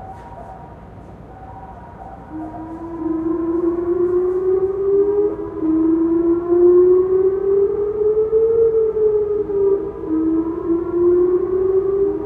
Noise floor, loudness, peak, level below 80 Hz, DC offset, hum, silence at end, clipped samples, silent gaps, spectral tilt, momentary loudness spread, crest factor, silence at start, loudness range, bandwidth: -37 dBFS; -17 LUFS; -4 dBFS; -44 dBFS; under 0.1%; none; 0 s; under 0.1%; none; -11 dB/octave; 21 LU; 14 dB; 0 s; 10 LU; 2.6 kHz